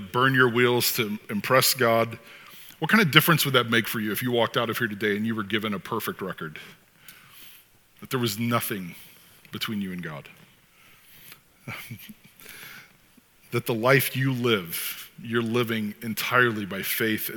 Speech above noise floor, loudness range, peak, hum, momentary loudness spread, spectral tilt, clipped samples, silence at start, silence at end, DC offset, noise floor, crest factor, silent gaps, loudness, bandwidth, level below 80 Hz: 33 dB; 15 LU; 0 dBFS; none; 22 LU; -4 dB/octave; under 0.1%; 0 s; 0 s; under 0.1%; -58 dBFS; 26 dB; none; -24 LUFS; 19 kHz; -68 dBFS